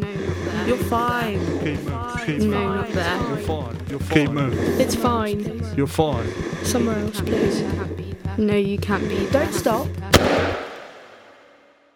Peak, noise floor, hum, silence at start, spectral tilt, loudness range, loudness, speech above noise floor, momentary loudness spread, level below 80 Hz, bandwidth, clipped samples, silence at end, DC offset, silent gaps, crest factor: 0 dBFS; -53 dBFS; none; 0 s; -5.5 dB/octave; 2 LU; -22 LUFS; 32 dB; 8 LU; -40 dBFS; 20 kHz; under 0.1%; 0.65 s; under 0.1%; none; 22 dB